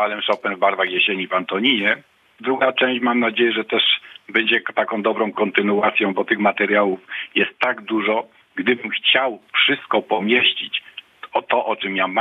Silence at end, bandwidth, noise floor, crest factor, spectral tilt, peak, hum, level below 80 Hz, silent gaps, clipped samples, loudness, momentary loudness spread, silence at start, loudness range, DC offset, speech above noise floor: 0 s; 6.2 kHz; -39 dBFS; 18 dB; -6 dB/octave; -2 dBFS; none; -76 dBFS; none; under 0.1%; -19 LUFS; 8 LU; 0 s; 1 LU; under 0.1%; 20 dB